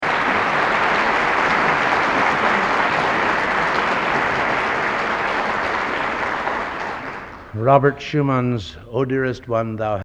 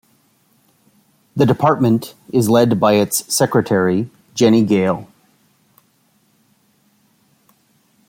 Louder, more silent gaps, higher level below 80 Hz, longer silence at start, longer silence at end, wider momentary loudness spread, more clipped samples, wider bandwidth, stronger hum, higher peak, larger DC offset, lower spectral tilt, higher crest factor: second, -19 LUFS vs -16 LUFS; neither; first, -46 dBFS vs -58 dBFS; second, 0 s vs 1.35 s; second, 0 s vs 3.05 s; about the same, 8 LU vs 8 LU; neither; second, 12 kHz vs 16.5 kHz; neither; about the same, 0 dBFS vs -2 dBFS; neither; about the same, -5.5 dB/octave vs -5.5 dB/octave; about the same, 20 dB vs 16 dB